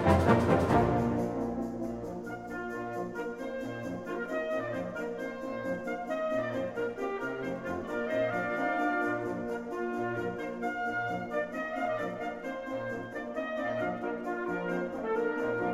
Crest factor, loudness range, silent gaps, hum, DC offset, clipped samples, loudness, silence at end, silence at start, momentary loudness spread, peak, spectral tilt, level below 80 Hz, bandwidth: 20 dB; 4 LU; none; none; under 0.1%; under 0.1%; -33 LUFS; 0 s; 0 s; 10 LU; -12 dBFS; -7.5 dB/octave; -54 dBFS; 15.5 kHz